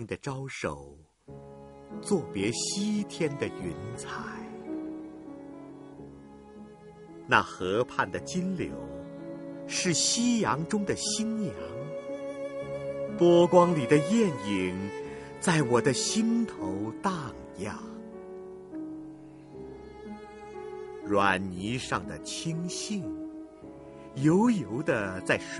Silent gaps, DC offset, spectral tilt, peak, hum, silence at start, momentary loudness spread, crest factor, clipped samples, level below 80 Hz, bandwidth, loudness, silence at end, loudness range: none; under 0.1%; -4.5 dB/octave; -6 dBFS; none; 0 s; 22 LU; 24 dB; under 0.1%; -60 dBFS; 11.5 kHz; -29 LUFS; 0 s; 13 LU